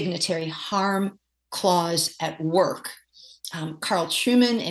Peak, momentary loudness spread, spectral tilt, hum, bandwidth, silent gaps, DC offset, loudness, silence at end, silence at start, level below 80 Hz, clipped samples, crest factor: -8 dBFS; 14 LU; -4 dB/octave; none; 13 kHz; none; under 0.1%; -24 LUFS; 0 s; 0 s; -72 dBFS; under 0.1%; 18 dB